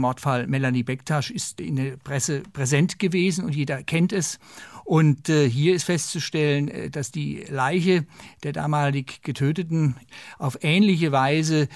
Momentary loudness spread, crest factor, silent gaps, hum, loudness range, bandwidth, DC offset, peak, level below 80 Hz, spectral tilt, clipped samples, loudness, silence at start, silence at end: 11 LU; 16 dB; none; none; 2 LU; 12 kHz; under 0.1%; -8 dBFS; -62 dBFS; -5.5 dB/octave; under 0.1%; -23 LUFS; 0 s; 0 s